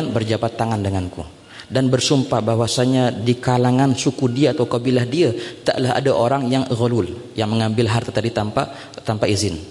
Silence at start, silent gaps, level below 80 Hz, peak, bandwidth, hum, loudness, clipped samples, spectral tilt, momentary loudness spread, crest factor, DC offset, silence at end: 0 s; none; -52 dBFS; -4 dBFS; 11.5 kHz; none; -19 LUFS; under 0.1%; -5.5 dB/octave; 8 LU; 14 dB; under 0.1%; 0 s